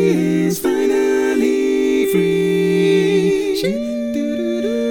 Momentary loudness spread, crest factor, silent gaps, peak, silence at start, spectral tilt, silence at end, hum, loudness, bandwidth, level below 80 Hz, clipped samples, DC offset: 6 LU; 12 dB; none; -4 dBFS; 0 s; -6 dB/octave; 0 s; none; -17 LUFS; 19 kHz; -48 dBFS; under 0.1%; under 0.1%